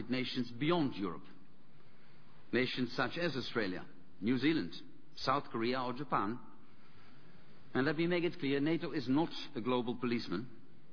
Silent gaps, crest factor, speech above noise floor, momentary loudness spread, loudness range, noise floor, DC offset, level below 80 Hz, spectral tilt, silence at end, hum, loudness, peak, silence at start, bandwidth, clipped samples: none; 18 dB; 28 dB; 9 LU; 3 LU; -64 dBFS; 0.6%; -70 dBFS; -4 dB/octave; 0.35 s; none; -36 LUFS; -18 dBFS; 0 s; 5.4 kHz; under 0.1%